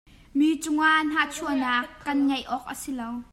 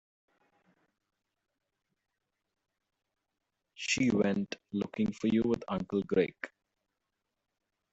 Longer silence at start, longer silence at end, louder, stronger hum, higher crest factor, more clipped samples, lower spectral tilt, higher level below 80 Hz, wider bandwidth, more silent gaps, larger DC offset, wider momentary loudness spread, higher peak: second, 0.35 s vs 3.8 s; second, 0.1 s vs 1.45 s; first, -25 LUFS vs -32 LUFS; neither; second, 16 dB vs 22 dB; neither; second, -2.5 dB/octave vs -5 dB/octave; first, -56 dBFS vs -66 dBFS; first, 16 kHz vs 8 kHz; neither; neither; first, 12 LU vs 9 LU; first, -10 dBFS vs -14 dBFS